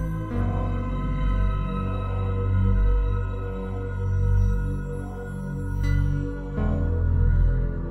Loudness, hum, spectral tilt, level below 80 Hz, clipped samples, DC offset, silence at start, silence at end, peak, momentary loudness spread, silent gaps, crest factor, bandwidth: -26 LUFS; none; -9 dB/octave; -26 dBFS; under 0.1%; under 0.1%; 0 s; 0 s; -10 dBFS; 8 LU; none; 14 dB; 6 kHz